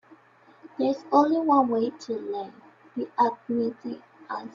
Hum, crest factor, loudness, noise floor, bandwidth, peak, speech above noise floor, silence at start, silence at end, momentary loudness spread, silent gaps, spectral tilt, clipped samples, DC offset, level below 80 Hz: none; 20 dB; -26 LUFS; -56 dBFS; 7.4 kHz; -6 dBFS; 31 dB; 0.65 s; 0.05 s; 17 LU; none; -6.5 dB/octave; under 0.1%; under 0.1%; -74 dBFS